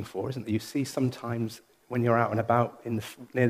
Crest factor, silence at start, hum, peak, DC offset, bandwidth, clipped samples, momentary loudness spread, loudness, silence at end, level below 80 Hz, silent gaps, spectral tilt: 20 dB; 0 s; none; -8 dBFS; under 0.1%; 15.5 kHz; under 0.1%; 10 LU; -29 LUFS; 0 s; -66 dBFS; none; -7 dB/octave